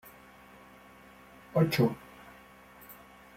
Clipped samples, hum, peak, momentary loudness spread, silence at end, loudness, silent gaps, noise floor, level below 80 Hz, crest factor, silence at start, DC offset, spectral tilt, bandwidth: under 0.1%; none; -14 dBFS; 26 LU; 0.45 s; -29 LUFS; none; -55 dBFS; -64 dBFS; 22 dB; 1.55 s; under 0.1%; -7 dB/octave; 16.5 kHz